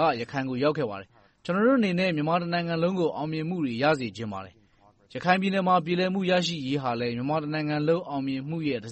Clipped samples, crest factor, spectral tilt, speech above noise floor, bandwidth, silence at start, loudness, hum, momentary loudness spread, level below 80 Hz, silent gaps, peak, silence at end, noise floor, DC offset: under 0.1%; 20 dB; -6.5 dB/octave; 34 dB; 8.4 kHz; 0 s; -26 LUFS; none; 8 LU; -64 dBFS; none; -6 dBFS; 0 s; -60 dBFS; under 0.1%